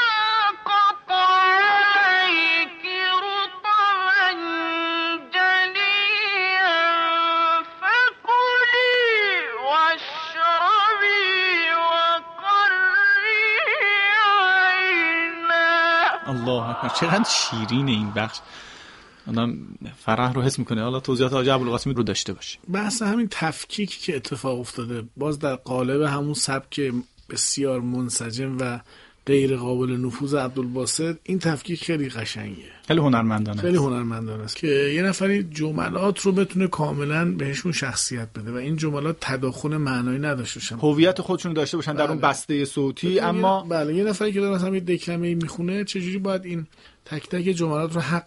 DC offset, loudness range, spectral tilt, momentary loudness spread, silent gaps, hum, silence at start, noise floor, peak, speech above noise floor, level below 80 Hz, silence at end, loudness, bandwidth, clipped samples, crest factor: under 0.1%; 8 LU; -4 dB/octave; 11 LU; none; none; 0 s; -46 dBFS; -4 dBFS; 22 dB; -56 dBFS; 0.05 s; -21 LUFS; 11.5 kHz; under 0.1%; 18 dB